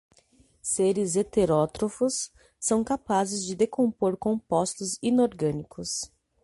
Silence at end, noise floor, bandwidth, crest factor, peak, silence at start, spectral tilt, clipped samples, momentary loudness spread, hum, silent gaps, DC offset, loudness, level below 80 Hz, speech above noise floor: 0.35 s; -61 dBFS; 11.5 kHz; 16 dB; -10 dBFS; 0.65 s; -5 dB/octave; under 0.1%; 8 LU; none; none; under 0.1%; -27 LUFS; -56 dBFS; 36 dB